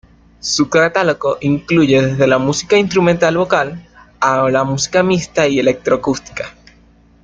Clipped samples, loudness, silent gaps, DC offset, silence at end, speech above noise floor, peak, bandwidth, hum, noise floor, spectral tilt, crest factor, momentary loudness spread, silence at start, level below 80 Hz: under 0.1%; -14 LUFS; none; under 0.1%; 0.75 s; 34 dB; 0 dBFS; 9.4 kHz; none; -48 dBFS; -5 dB/octave; 14 dB; 9 LU; 0.45 s; -46 dBFS